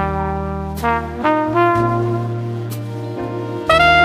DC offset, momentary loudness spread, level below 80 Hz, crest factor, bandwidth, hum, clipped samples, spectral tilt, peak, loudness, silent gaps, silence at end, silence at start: under 0.1%; 11 LU; -34 dBFS; 16 dB; 15.5 kHz; none; under 0.1%; -6.5 dB/octave; 0 dBFS; -18 LUFS; none; 0 s; 0 s